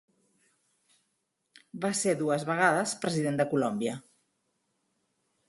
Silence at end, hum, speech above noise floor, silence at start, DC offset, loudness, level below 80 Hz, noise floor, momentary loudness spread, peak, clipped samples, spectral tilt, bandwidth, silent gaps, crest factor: 1.5 s; none; 51 dB; 1.75 s; under 0.1%; -29 LUFS; -74 dBFS; -79 dBFS; 10 LU; -8 dBFS; under 0.1%; -4.5 dB/octave; 12 kHz; none; 24 dB